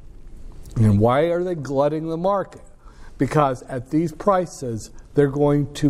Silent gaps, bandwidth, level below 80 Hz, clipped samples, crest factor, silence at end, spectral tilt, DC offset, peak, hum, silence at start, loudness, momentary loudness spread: none; 13.5 kHz; -40 dBFS; under 0.1%; 18 dB; 0 s; -7.5 dB/octave; under 0.1%; -4 dBFS; none; 0 s; -21 LUFS; 12 LU